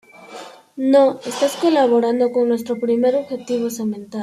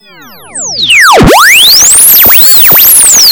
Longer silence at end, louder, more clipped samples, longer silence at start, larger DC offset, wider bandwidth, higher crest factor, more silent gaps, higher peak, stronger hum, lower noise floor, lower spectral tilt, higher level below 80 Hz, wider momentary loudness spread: about the same, 0 s vs 0 s; second, -18 LUFS vs 1 LUFS; second, under 0.1% vs 20%; second, 0.2 s vs 0.55 s; second, under 0.1% vs 0.8%; second, 14.5 kHz vs over 20 kHz; first, 16 dB vs 2 dB; neither; about the same, -2 dBFS vs 0 dBFS; neither; first, -38 dBFS vs -31 dBFS; first, -5 dB/octave vs -1 dB/octave; second, -68 dBFS vs -24 dBFS; first, 22 LU vs 8 LU